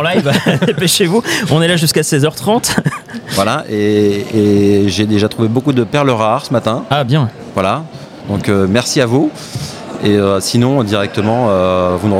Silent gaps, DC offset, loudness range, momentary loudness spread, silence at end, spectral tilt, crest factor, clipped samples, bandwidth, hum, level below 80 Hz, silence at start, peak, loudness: none; under 0.1%; 2 LU; 7 LU; 0 s; -5 dB/octave; 12 dB; under 0.1%; 16.5 kHz; none; -46 dBFS; 0 s; 0 dBFS; -13 LUFS